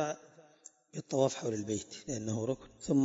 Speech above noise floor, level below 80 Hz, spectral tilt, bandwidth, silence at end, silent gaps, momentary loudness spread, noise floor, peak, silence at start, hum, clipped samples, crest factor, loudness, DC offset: 26 dB; -68 dBFS; -6.5 dB/octave; 7.6 kHz; 0 s; none; 19 LU; -60 dBFS; -14 dBFS; 0 s; none; under 0.1%; 20 dB; -36 LUFS; under 0.1%